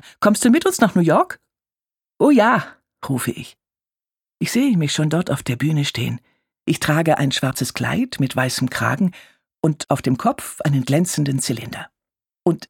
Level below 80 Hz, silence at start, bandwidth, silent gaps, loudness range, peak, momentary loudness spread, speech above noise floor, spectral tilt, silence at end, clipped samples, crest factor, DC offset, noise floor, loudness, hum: -56 dBFS; 0.05 s; 17.5 kHz; none; 3 LU; -2 dBFS; 12 LU; over 72 dB; -5.5 dB/octave; 0.05 s; under 0.1%; 18 dB; under 0.1%; under -90 dBFS; -19 LUFS; none